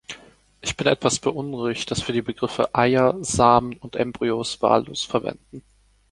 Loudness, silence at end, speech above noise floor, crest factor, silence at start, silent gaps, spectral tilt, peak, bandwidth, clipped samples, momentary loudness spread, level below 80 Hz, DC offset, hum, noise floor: -22 LUFS; 0.5 s; 28 dB; 20 dB; 0.1 s; none; -4.5 dB/octave; -2 dBFS; 11.5 kHz; under 0.1%; 13 LU; -48 dBFS; under 0.1%; none; -50 dBFS